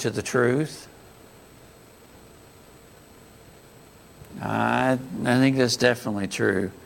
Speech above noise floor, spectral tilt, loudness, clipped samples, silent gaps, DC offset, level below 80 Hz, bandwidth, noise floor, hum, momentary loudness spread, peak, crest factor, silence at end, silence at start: 27 dB; -5 dB/octave; -23 LUFS; under 0.1%; none; under 0.1%; -58 dBFS; 17 kHz; -50 dBFS; none; 14 LU; -4 dBFS; 22 dB; 0 s; 0 s